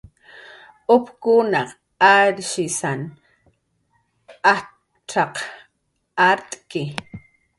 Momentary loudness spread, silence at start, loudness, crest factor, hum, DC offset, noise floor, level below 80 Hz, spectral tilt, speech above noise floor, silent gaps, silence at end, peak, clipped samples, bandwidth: 16 LU; 0.35 s; -19 LUFS; 20 dB; none; under 0.1%; -71 dBFS; -62 dBFS; -3.5 dB/octave; 53 dB; none; 0.4 s; 0 dBFS; under 0.1%; 11.5 kHz